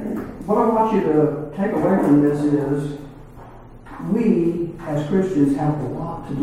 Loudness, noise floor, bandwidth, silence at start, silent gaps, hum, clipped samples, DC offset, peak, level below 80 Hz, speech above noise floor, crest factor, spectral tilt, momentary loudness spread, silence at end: -20 LUFS; -40 dBFS; 12 kHz; 0 s; none; none; under 0.1%; under 0.1%; -4 dBFS; -44 dBFS; 21 dB; 16 dB; -9 dB/octave; 13 LU; 0 s